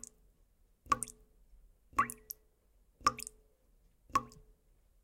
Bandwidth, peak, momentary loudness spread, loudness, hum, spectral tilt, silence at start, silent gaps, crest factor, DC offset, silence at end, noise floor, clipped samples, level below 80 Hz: 16.5 kHz; -14 dBFS; 14 LU; -37 LUFS; none; -2 dB/octave; 0.85 s; none; 28 dB; under 0.1%; 0.75 s; -70 dBFS; under 0.1%; -62 dBFS